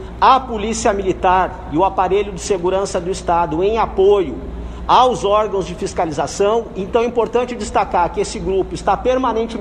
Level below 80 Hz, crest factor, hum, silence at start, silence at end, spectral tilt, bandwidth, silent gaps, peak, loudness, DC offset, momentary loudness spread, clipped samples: -34 dBFS; 16 dB; none; 0 s; 0 s; -5 dB/octave; 10.5 kHz; none; 0 dBFS; -17 LUFS; under 0.1%; 8 LU; under 0.1%